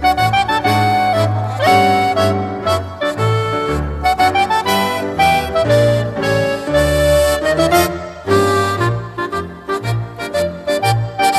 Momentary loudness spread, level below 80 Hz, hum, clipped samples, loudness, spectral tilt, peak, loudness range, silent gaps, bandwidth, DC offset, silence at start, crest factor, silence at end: 8 LU; -32 dBFS; none; under 0.1%; -15 LUFS; -5 dB/octave; 0 dBFS; 3 LU; none; 14 kHz; under 0.1%; 0 s; 14 dB; 0 s